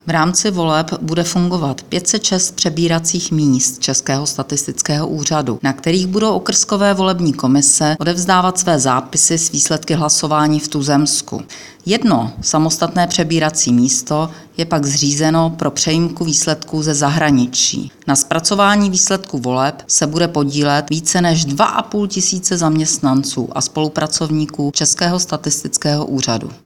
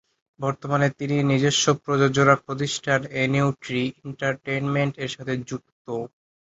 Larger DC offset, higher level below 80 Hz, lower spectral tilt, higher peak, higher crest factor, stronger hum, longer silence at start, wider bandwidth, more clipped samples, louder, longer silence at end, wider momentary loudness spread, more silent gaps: neither; first, -48 dBFS vs -60 dBFS; second, -3.5 dB/octave vs -5 dB/octave; about the same, 0 dBFS vs -2 dBFS; second, 16 dB vs 22 dB; neither; second, 0.05 s vs 0.4 s; first, 17 kHz vs 8 kHz; neither; first, -15 LUFS vs -23 LUFS; second, 0.1 s vs 0.4 s; second, 6 LU vs 13 LU; second, none vs 5.72-5.85 s